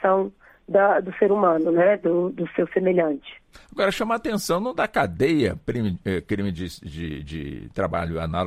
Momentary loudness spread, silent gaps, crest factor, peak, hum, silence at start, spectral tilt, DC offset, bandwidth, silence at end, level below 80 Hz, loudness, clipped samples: 14 LU; none; 18 dB; -6 dBFS; none; 0 s; -6.5 dB/octave; under 0.1%; 16 kHz; 0 s; -46 dBFS; -23 LUFS; under 0.1%